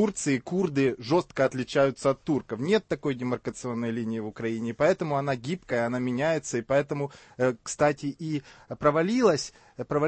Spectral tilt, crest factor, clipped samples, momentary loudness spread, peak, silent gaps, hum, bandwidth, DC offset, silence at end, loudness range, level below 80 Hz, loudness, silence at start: -5.5 dB/octave; 18 dB; under 0.1%; 9 LU; -8 dBFS; none; none; 8.8 kHz; under 0.1%; 0 s; 2 LU; -60 dBFS; -27 LUFS; 0 s